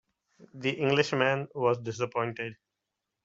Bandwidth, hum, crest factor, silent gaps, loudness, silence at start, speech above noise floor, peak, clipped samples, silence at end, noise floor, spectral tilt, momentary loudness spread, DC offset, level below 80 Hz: 8 kHz; none; 22 dB; none; -29 LUFS; 0.4 s; 57 dB; -8 dBFS; under 0.1%; 0.7 s; -86 dBFS; -5.5 dB/octave; 8 LU; under 0.1%; -70 dBFS